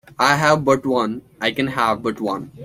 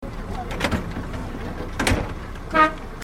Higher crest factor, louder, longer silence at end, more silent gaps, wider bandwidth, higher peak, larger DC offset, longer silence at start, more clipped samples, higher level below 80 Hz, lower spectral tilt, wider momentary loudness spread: about the same, 18 dB vs 20 dB; first, -19 LUFS vs -24 LUFS; about the same, 0 s vs 0 s; neither; about the same, 16 kHz vs 16 kHz; first, 0 dBFS vs -4 dBFS; neither; first, 0.2 s vs 0 s; neither; second, -54 dBFS vs -32 dBFS; about the same, -5 dB/octave vs -5 dB/octave; second, 9 LU vs 13 LU